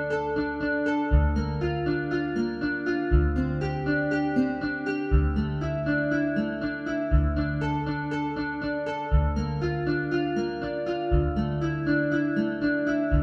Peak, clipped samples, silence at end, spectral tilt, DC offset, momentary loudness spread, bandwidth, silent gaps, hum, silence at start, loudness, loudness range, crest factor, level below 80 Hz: -8 dBFS; under 0.1%; 0 s; -8.5 dB/octave; under 0.1%; 5 LU; 7 kHz; none; none; 0 s; -27 LUFS; 1 LU; 18 dB; -32 dBFS